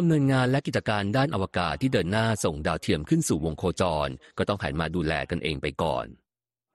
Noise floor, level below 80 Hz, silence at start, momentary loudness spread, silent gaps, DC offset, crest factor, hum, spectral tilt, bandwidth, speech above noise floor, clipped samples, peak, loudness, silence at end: under -90 dBFS; -46 dBFS; 0 s; 6 LU; none; under 0.1%; 16 dB; none; -5.5 dB/octave; 12.5 kHz; over 64 dB; under 0.1%; -10 dBFS; -26 LUFS; 0.6 s